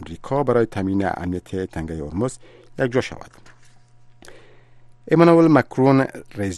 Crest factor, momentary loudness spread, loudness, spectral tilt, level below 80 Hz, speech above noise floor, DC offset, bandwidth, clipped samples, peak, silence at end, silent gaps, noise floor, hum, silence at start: 20 dB; 15 LU; -20 LUFS; -7.5 dB/octave; -48 dBFS; 28 dB; under 0.1%; 12 kHz; under 0.1%; 0 dBFS; 0 s; none; -47 dBFS; none; 0 s